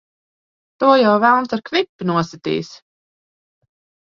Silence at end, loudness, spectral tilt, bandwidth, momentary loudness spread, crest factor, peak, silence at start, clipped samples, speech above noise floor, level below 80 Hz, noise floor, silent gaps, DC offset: 1.35 s; -17 LUFS; -6 dB/octave; 7.4 kHz; 11 LU; 20 dB; 0 dBFS; 0.8 s; under 0.1%; over 73 dB; -64 dBFS; under -90 dBFS; 1.89-1.99 s; under 0.1%